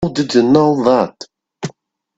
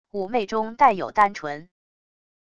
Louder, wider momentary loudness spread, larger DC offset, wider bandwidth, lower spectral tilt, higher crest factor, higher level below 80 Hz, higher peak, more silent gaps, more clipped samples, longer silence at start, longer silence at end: first, -13 LUFS vs -22 LUFS; first, 17 LU vs 14 LU; neither; second, 8 kHz vs 11 kHz; first, -6.5 dB/octave vs -5 dB/octave; about the same, 16 dB vs 20 dB; first, -48 dBFS vs -60 dBFS; first, 0 dBFS vs -4 dBFS; neither; neither; about the same, 0 s vs 0.05 s; second, 0.45 s vs 0.75 s